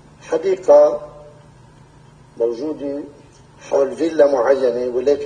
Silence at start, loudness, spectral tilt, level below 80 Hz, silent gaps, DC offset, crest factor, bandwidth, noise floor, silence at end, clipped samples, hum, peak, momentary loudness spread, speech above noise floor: 0.25 s; -17 LUFS; -5.5 dB/octave; -56 dBFS; none; under 0.1%; 18 dB; 9.4 kHz; -46 dBFS; 0 s; under 0.1%; none; 0 dBFS; 16 LU; 30 dB